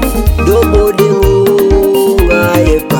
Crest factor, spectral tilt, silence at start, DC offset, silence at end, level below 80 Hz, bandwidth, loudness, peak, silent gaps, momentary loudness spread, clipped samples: 8 dB; -6.5 dB/octave; 0 s; under 0.1%; 0 s; -16 dBFS; 19.5 kHz; -9 LUFS; 0 dBFS; none; 2 LU; 0.5%